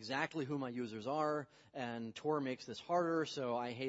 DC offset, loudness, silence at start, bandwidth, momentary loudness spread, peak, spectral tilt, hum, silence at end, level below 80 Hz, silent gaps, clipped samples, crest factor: under 0.1%; -40 LUFS; 0 s; 7.6 kHz; 8 LU; -22 dBFS; -4 dB/octave; none; 0 s; -82 dBFS; none; under 0.1%; 18 dB